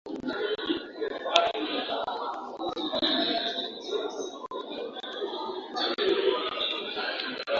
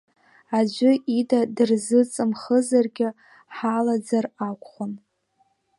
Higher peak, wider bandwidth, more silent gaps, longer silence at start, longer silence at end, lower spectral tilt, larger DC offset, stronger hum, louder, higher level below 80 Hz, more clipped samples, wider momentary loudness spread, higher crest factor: first, 0 dBFS vs -6 dBFS; second, 7.6 kHz vs 11.5 kHz; neither; second, 0.05 s vs 0.5 s; second, 0 s vs 0.8 s; second, -2.5 dB/octave vs -5.5 dB/octave; neither; neither; second, -30 LUFS vs -23 LUFS; first, -68 dBFS vs -76 dBFS; neither; second, 11 LU vs 14 LU; first, 30 dB vs 16 dB